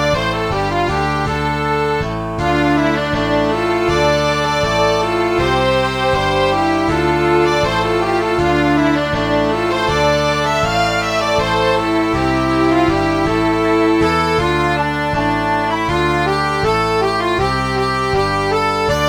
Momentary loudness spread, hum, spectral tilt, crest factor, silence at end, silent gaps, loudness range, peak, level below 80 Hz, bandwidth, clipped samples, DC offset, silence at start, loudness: 3 LU; none; -5.5 dB/octave; 14 dB; 0 s; none; 1 LU; -2 dBFS; -32 dBFS; over 20 kHz; under 0.1%; under 0.1%; 0 s; -16 LUFS